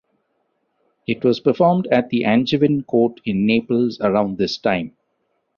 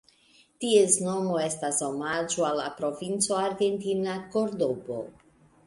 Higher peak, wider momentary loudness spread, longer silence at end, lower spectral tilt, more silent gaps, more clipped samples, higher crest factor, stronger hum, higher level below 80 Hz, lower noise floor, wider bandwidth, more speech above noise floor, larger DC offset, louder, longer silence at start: first, -2 dBFS vs -8 dBFS; second, 5 LU vs 10 LU; first, 0.7 s vs 0.55 s; first, -7.5 dB/octave vs -3.5 dB/octave; neither; neither; about the same, 16 dB vs 20 dB; neither; first, -56 dBFS vs -68 dBFS; first, -70 dBFS vs -61 dBFS; second, 7 kHz vs 11.5 kHz; first, 52 dB vs 34 dB; neither; first, -19 LUFS vs -27 LUFS; first, 1.1 s vs 0.6 s